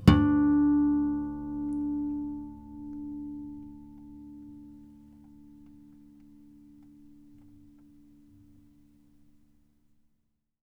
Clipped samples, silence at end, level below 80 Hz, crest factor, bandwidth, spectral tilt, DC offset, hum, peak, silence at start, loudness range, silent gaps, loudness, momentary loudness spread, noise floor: under 0.1%; 5.2 s; -46 dBFS; 28 dB; 8 kHz; -8 dB/octave; under 0.1%; none; -4 dBFS; 0 s; 27 LU; none; -28 LUFS; 25 LU; -75 dBFS